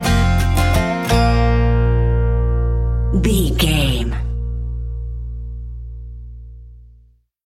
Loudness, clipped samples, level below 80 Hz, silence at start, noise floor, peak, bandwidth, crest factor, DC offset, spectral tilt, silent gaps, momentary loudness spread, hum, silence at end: -18 LUFS; under 0.1%; -20 dBFS; 0 s; -51 dBFS; -2 dBFS; 16 kHz; 16 dB; under 0.1%; -6 dB/octave; none; 17 LU; none; 0.65 s